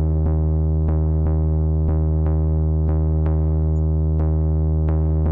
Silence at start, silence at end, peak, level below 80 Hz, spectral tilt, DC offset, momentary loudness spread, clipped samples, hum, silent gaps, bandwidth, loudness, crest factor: 0 s; 0 s; -14 dBFS; -24 dBFS; -13.5 dB/octave; under 0.1%; 0 LU; under 0.1%; none; none; 2 kHz; -20 LUFS; 4 dB